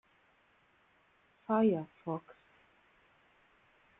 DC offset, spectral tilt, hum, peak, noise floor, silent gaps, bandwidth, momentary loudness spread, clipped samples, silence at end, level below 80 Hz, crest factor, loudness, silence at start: under 0.1%; -10.5 dB/octave; none; -18 dBFS; -70 dBFS; none; 3.9 kHz; 13 LU; under 0.1%; 1.7 s; -80 dBFS; 20 dB; -34 LUFS; 1.5 s